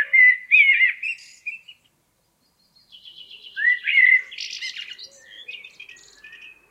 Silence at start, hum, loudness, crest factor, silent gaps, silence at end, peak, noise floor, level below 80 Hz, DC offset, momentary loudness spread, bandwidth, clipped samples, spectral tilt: 0 s; none; -16 LUFS; 18 dB; none; 1.15 s; -4 dBFS; -67 dBFS; -78 dBFS; under 0.1%; 25 LU; 10.5 kHz; under 0.1%; 3 dB/octave